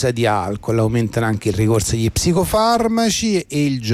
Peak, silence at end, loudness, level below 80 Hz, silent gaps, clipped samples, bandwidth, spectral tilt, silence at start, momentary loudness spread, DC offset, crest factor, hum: -6 dBFS; 0 s; -18 LUFS; -36 dBFS; none; under 0.1%; 16 kHz; -5 dB/octave; 0 s; 4 LU; under 0.1%; 12 dB; none